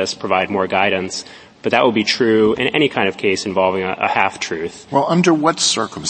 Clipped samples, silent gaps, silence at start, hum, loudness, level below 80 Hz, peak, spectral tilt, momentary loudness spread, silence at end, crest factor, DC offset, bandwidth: under 0.1%; none; 0 s; none; -17 LUFS; -56 dBFS; 0 dBFS; -4 dB/octave; 9 LU; 0 s; 18 dB; under 0.1%; 8.8 kHz